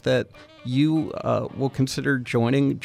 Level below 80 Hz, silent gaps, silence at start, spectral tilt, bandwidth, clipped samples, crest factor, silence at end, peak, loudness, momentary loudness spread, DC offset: -56 dBFS; none; 0.05 s; -6.5 dB/octave; 14.5 kHz; under 0.1%; 14 dB; 0 s; -10 dBFS; -24 LUFS; 6 LU; under 0.1%